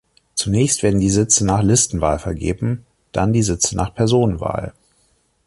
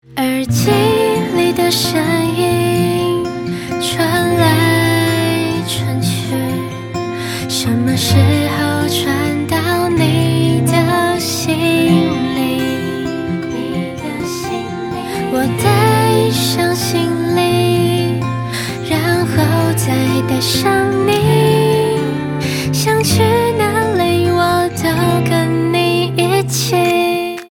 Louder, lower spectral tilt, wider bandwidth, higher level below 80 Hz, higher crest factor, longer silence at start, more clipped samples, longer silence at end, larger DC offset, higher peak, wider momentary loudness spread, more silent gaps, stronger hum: second, -18 LUFS vs -15 LUFS; about the same, -5 dB/octave vs -5 dB/octave; second, 11.5 kHz vs 18 kHz; first, -36 dBFS vs -44 dBFS; about the same, 16 dB vs 14 dB; first, 0.35 s vs 0.1 s; neither; first, 0.75 s vs 0.05 s; neither; about the same, -2 dBFS vs 0 dBFS; first, 11 LU vs 8 LU; neither; neither